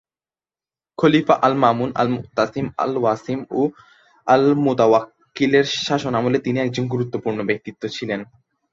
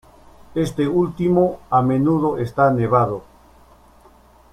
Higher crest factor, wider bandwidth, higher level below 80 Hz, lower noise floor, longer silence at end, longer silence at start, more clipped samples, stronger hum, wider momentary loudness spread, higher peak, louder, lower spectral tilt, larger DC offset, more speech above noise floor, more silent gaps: about the same, 18 dB vs 18 dB; second, 7.6 kHz vs 13.5 kHz; second, -58 dBFS vs -48 dBFS; first, under -90 dBFS vs -50 dBFS; second, 0.5 s vs 1.3 s; first, 1 s vs 0.55 s; neither; neither; first, 10 LU vs 7 LU; about the same, -2 dBFS vs -2 dBFS; about the same, -20 LUFS vs -19 LUFS; second, -6 dB/octave vs -8.5 dB/octave; neither; first, over 71 dB vs 32 dB; neither